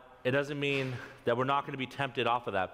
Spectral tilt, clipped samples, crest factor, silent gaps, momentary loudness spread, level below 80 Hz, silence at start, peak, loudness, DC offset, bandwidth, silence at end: -6 dB/octave; under 0.1%; 18 dB; none; 6 LU; -68 dBFS; 0 s; -14 dBFS; -32 LUFS; under 0.1%; 15 kHz; 0 s